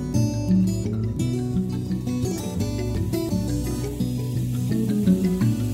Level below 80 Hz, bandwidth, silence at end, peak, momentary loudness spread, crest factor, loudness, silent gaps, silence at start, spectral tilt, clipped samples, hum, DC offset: -38 dBFS; 16 kHz; 0 s; -8 dBFS; 6 LU; 16 dB; -24 LUFS; none; 0 s; -7.5 dB/octave; under 0.1%; none; under 0.1%